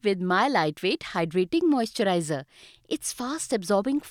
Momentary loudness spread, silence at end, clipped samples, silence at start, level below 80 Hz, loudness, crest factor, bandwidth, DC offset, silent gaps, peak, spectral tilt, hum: 8 LU; 0 s; under 0.1%; 0.05 s; -64 dBFS; -26 LUFS; 18 dB; 16.5 kHz; under 0.1%; none; -8 dBFS; -4.5 dB/octave; none